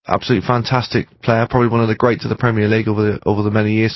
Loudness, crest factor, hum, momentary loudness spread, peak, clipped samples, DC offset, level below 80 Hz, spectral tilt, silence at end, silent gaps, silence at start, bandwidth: -16 LUFS; 16 dB; none; 3 LU; 0 dBFS; under 0.1%; under 0.1%; -42 dBFS; -8 dB/octave; 0 s; none; 0.1 s; 6 kHz